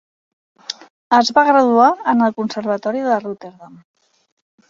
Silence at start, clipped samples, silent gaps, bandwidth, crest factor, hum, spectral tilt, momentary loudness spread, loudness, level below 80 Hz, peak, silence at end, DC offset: 0.7 s; under 0.1%; 0.90-1.11 s; 7.6 kHz; 16 dB; none; -4.5 dB/octave; 19 LU; -15 LUFS; -66 dBFS; -2 dBFS; 1 s; under 0.1%